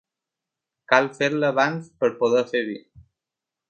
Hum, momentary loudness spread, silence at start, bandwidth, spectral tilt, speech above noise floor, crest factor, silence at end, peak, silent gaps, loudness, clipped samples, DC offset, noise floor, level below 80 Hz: none; 7 LU; 0.9 s; 8.6 kHz; -5 dB/octave; 66 dB; 24 dB; 0.9 s; 0 dBFS; none; -22 LUFS; under 0.1%; under 0.1%; -87 dBFS; -66 dBFS